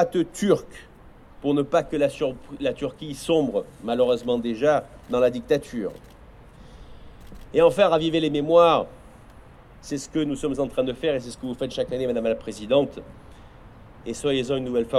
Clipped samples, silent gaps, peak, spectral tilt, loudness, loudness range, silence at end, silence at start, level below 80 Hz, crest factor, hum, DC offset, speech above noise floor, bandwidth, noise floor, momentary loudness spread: under 0.1%; none; -6 dBFS; -5.5 dB/octave; -24 LUFS; 5 LU; 0 s; 0 s; -50 dBFS; 18 dB; none; under 0.1%; 24 dB; 13 kHz; -47 dBFS; 13 LU